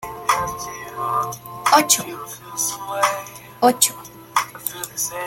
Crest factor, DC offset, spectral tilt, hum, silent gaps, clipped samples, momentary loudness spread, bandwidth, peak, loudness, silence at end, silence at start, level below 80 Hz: 22 dB; under 0.1%; -1.5 dB/octave; none; none; under 0.1%; 15 LU; 17 kHz; 0 dBFS; -20 LUFS; 0 s; 0 s; -56 dBFS